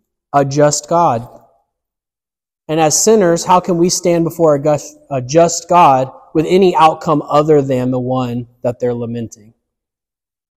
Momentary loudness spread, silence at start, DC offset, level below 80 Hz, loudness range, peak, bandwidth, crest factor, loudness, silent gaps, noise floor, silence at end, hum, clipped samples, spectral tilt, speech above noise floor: 12 LU; 0.35 s; under 0.1%; -50 dBFS; 4 LU; 0 dBFS; 15.5 kHz; 14 dB; -13 LUFS; none; under -90 dBFS; 1.3 s; none; under 0.1%; -5 dB/octave; over 77 dB